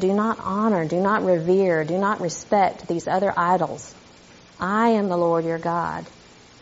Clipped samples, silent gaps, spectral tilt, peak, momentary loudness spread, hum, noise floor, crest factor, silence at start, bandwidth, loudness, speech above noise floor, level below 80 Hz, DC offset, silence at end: under 0.1%; none; -5.5 dB/octave; -6 dBFS; 9 LU; none; -48 dBFS; 16 dB; 0 s; 8 kHz; -22 LUFS; 27 dB; -58 dBFS; under 0.1%; 0.55 s